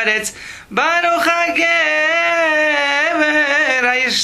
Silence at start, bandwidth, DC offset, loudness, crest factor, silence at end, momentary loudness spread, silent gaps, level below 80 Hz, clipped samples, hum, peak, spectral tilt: 0 s; 14 kHz; under 0.1%; -14 LUFS; 14 dB; 0 s; 5 LU; none; -54 dBFS; under 0.1%; none; 0 dBFS; -1.5 dB/octave